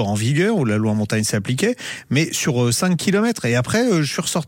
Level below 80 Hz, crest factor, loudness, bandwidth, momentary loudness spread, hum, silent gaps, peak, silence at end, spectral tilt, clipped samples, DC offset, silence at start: -52 dBFS; 14 dB; -19 LUFS; 17 kHz; 3 LU; none; none; -6 dBFS; 0 s; -5 dB/octave; under 0.1%; under 0.1%; 0 s